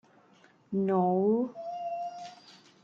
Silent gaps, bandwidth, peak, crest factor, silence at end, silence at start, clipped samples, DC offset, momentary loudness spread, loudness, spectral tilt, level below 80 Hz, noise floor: none; 7.4 kHz; -14 dBFS; 16 dB; 0.3 s; 0.7 s; under 0.1%; under 0.1%; 15 LU; -30 LUFS; -9 dB/octave; -76 dBFS; -61 dBFS